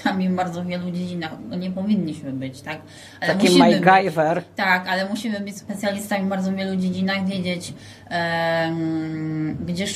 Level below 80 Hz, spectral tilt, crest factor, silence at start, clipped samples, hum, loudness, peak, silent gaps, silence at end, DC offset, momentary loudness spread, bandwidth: -58 dBFS; -5.5 dB/octave; 20 dB; 0 s; under 0.1%; none; -22 LUFS; -2 dBFS; none; 0 s; under 0.1%; 15 LU; 14.5 kHz